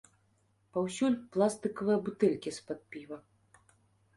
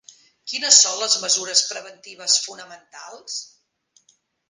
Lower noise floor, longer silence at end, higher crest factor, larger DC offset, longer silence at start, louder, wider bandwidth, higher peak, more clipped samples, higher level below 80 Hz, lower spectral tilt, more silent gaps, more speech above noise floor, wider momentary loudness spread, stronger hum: first, -72 dBFS vs -63 dBFS; about the same, 1 s vs 1.05 s; about the same, 20 dB vs 24 dB; neither; first, 0.75 s vs 0.45 s; second, -32 LUFS vs -17 LUFS; second, 11.5 kHz vs 16 kHz; second, -14 dBFS vs 0 dBFS; neither; first, -72 dBFS vs -82 dBFS; first, -6 dB/octave vs 2.5 dB/octave; neither; about the same, 40 dB vs 42 dB; second, 15 LU vs 27 LU; neither